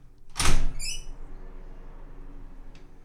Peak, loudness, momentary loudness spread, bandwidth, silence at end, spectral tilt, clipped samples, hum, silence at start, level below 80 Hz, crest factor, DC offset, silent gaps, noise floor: -6 dBFS; -30 LUFS; 23 LU; 12.5 kHz; 0.35 s; -2.5 dB/octave; under 0.1%; none; 0.25 s; -28 dBFS; 20 dB; under 0.1%; none; -42 dBFS